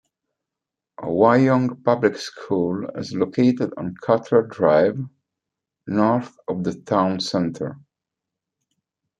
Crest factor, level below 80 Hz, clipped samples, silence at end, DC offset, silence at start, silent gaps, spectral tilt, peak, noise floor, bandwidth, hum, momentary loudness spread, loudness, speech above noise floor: 20 dB; -64 dBFS; under 0.1%; 1.45 s; under 0.1%; 1 s; none; -7 dB/octave; -2 dBFS; -86 dBFS; 9 kHz; none; 14 LU; -21 LUFS; 66 dB